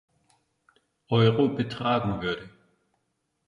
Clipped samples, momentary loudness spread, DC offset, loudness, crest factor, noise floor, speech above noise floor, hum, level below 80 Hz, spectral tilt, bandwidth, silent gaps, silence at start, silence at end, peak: under 0.1%; 10 LU; under 0.1%; -26 LUFS; 20 dB; -77 dBFS; 52 dB; none; -56 dBFS; -8 dB/octave; 7.2 kHz; none; 1.1 s; 1 s; -8 dBFS